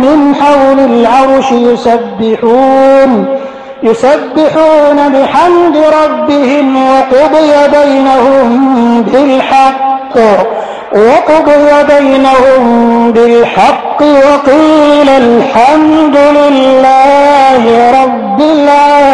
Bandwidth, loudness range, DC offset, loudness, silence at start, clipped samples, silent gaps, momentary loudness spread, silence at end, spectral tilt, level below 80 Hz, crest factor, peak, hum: 11 kHz; 2 LU; under 0.1%; -6 LUFS; 0 s; 0.7%; none; 4 LU; 0 s; -5.5 dB/octave; -40 dBFS; 6 dB; 0 dBFS; none